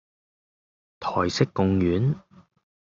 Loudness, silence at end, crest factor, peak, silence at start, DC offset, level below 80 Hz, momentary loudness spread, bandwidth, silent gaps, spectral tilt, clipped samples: -25 LUFS; 0.7 s; 20 dB; -6 dBFS; 1 s; under 0.1%; -56 dBFS; 10 LU; 7.6 kHz; none; -6.5 dB/octave; under 0.1%